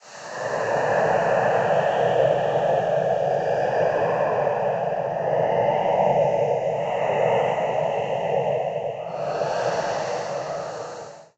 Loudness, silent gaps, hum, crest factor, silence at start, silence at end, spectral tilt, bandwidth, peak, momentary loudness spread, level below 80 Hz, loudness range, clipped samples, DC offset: -23 LUFS; none; none; 16 dB; 0.05 s; 0.15 s; -5.5 dB/octave; 8.4 kHz; -8 dBFS; 9 LU; -60 dBFS; 4 LU; under 0.1%; under 0.1%